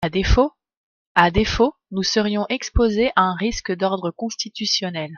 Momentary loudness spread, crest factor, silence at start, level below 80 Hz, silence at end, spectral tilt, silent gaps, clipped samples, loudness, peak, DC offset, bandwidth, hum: 7 LU; 20 dB; 0 s; -30 dBFS; 0 s; -4.5 dB/octave; 0.77-1.15 s; under 0.1%; -20 LUFS; 0 dBFS; under 0.1%; 7.4 kHz; none